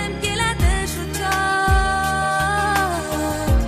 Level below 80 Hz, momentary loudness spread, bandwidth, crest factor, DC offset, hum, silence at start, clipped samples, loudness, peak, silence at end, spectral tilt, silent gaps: -26 dBFS; 5 LU; 15.5 kHz; 14 dB; under 0.1%; none; 0 s; under 0.1%; -20 LUFS; -6 dBFS; 0 s; -4 dB/octave; none